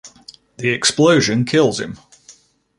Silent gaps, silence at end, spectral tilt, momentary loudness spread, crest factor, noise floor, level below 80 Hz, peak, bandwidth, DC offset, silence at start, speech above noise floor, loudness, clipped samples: none; 0.5 s; -4 dB/octave; 15 LU; 16 dB; -49 dBFS; -54 dBFS; -2 dBFS; 11.5 kHz; under 0.1%; 0.05 s; 33 dB; -16 LUFS; under 0.1%